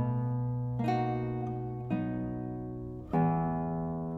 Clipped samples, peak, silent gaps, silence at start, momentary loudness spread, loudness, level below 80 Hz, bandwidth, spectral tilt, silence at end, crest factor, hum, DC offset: under 0.1%; -18 dBFS; none; 0 s; 9 LU; -33 LUFS; -52 dBFS; 6 kHz; -10 dB/octave; 0 s; 14 dB; none; under 0.1%